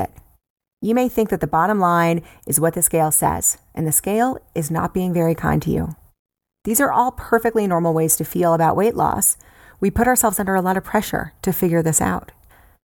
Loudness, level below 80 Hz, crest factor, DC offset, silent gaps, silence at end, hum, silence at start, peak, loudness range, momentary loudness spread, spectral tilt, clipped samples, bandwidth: -19 LUFS; -42 dBFS; 18 dB; under 0.1%; 0.50-0.56 s, 0.73-0.77 s, 6.19-6.25 s; 0.65 s; none; 0 s; -2 dBFS; 3 LU; 8 LU; -5 dB/octave; under 0.1%; 19.5 kHz